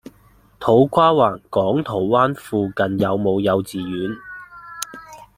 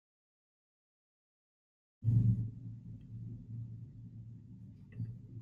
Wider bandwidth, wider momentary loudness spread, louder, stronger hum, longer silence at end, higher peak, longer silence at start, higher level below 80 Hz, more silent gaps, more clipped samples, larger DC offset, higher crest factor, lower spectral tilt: first, 16 kHz vs 2 kHz; second, 17 LU vs 21 LU; first, -19 LUFS vs -38 LUFS; neither; first, 0.15 s vs 0 s; first, -2 dBFS vs -18 dBFS; second, 0.6 s vs 2 s; about the same, -54 dBFS vs -58 dBFS; neither; neither; neither; about the same, 18 dB vs 22 dB; second, -6 dB/octave vs -11.5 dB/octave